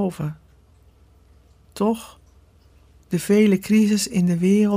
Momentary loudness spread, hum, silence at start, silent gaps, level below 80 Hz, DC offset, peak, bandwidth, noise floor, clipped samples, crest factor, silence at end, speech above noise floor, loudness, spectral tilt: 13 LU; none; 0 s; none; -54 dBFS; under 0.1%; -6 dBFS; 16 kHz; -53 dBFS; under 0.1%; 16 dB; 0 s; 34 dB; -20 LUFS; -6 dB/octave